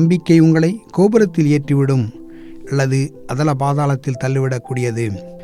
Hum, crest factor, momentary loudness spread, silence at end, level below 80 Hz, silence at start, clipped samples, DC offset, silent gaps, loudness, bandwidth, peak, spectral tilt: none; 14 dB; 11 LU; 0 s; -48 dBFS; 0 s; under 0.1%; under 0.1%; none; -16 LUFS; 11.5 kHz; -2 dBFS; -7.5 dB/octave